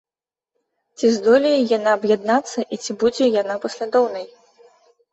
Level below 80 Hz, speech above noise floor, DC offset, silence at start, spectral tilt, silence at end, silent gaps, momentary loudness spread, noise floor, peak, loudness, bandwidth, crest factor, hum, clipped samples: -64 dBFS; over 72 dB; under 0.1%; 1 s; -4 dB/octave; 0.85 s; none; 11 LU; under -90 dBFS; -4 dBFS; -19 LUFS; 8.2 kHz; 16 dB; none; under 0.1%